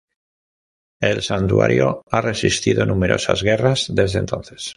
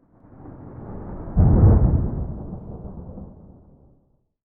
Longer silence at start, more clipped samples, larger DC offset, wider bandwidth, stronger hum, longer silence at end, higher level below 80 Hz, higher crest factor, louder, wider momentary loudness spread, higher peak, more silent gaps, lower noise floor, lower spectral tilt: first, 1 s vs 0.45 s; neither; neither; first, 11.5 kHz vs 2.1 kHz; neither; second, 0.05 s vs 1.2 s; second, -38 dBFS vs -26 dBFS; about the same, 16 dB vs 18 dB; about the same, -18 LUFS vs -19 LUFS; second, 5 LU vs 26 LU; about the same, -2 dBFS vs -4 dBFS; first, 2.03-2.07 s vs none; first, under -90 dBFS vs -62 dBFS; second, -5 dB/octave vs -15.5 dB/octave